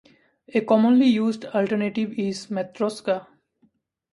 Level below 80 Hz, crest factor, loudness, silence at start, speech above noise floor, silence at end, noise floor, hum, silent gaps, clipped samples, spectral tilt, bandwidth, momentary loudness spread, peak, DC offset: -70 dBFS; 18 dB; -23 LUFS; 0.55 s; 44 dB; 0.9 s; -65 dBFS; none; none; under 0.1%; -6.5 dB/octave; 11.5 kHz; 11 LU; -6 dBFS; under 0.1%